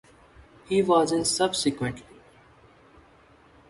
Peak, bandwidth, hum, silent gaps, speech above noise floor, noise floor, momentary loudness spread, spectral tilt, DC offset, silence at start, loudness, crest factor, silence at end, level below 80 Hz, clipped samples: -8 dBFS; 11.5 kHz; none; none; 32 dB; -56 dBFS; 11 LU; -4 dB/octave; under 0.1%; 0.7 s; -24 LUFS; 20 dB; 1.7 s; -58 dBFS; under 0.1%